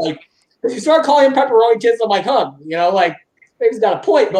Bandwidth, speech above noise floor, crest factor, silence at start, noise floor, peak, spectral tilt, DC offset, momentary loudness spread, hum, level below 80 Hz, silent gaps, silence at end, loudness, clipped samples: 10.5 kHz; 31 dB; 14 dB; 0 s; -45 dBFS; -2 dBFS; -4.5 dB/octave; under 0.1%; 11 LU; none; -68 dBFS; none; 0 s; -15 LUFS; under 0.1%